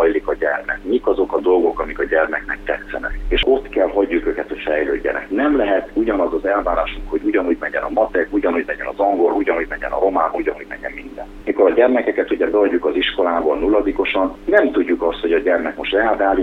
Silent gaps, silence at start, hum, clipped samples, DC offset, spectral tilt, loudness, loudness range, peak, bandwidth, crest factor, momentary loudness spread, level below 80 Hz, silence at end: none; 0 s; none; under 0.1%; under 0.1%; -6.5 dB/octave; -18 LUFS; 2 LU; -2 dBFS; 5.8 kHz; 16 dB; 8 LU; -36 dBFS; 0 s